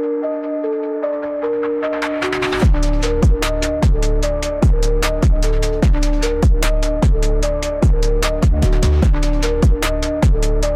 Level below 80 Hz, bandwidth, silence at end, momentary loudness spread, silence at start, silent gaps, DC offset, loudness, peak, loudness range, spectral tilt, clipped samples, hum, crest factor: -16 dBFS; 14 kHz; 0 s; 5 LU; 0 s; none; under 0.1%; -18 LUFS; -4 dBFS; 2 LU; -6 dB/octave; under 0.1%; none; 12 dB